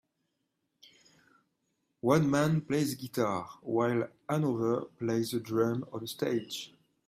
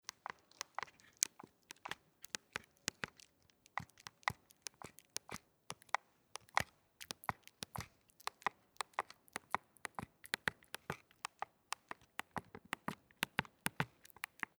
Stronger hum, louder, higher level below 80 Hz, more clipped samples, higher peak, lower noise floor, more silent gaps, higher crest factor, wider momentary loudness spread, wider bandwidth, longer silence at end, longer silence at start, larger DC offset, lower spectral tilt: neither; first, -31 LUFS vs -45 LUFS; about the same, -70 dBFS vs -74 dBFS; neither; second, -12 dBFS vs -6 dBFS; first, -81 dBFS vs -72 dBFS; neither; second, 20 dB vs 42 dB; second, 9 LU vs 12 LU; second, 16 kHz vs over 20 kHz; second, 0.4 s vs 0.7 s; first, 2.05 s vs 0.8 s; neither; first, -6 dB/octave vs -2 dB/octave